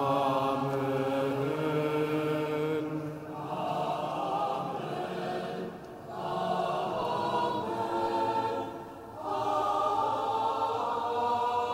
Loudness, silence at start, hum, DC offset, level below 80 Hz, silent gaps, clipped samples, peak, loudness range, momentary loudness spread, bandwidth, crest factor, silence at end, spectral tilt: -31 LUFS; 0 s; none; under 0.1%; -66 dBFS; none; under 0.1%; -16 dBFS; 3 LU; 9 LU; 16 kHz; 16 dB; 0 s; -6.5 dB/octave